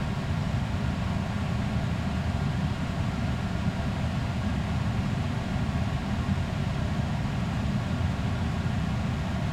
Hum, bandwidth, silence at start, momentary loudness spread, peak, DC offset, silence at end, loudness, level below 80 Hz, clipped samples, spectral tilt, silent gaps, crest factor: none; 13 kHz; 0 s; 1 LU; -16 dBFS; under 0.1%; 0 s; -29 LUFS; -38 dBFS; under 0.1%; -7 dB/octave; none; 12 dB